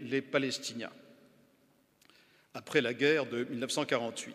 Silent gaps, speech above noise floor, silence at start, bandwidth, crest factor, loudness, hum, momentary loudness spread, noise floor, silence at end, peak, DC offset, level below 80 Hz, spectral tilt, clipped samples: none; 36 dB; 0 s; 15 kHz; 22 dB; -32 LUFS; none; 16 LU; -69 dBFS; 0 s; -12 dBFS; under 0.1%; -84 dBFS; -3.5 dB/octave; under 0.1%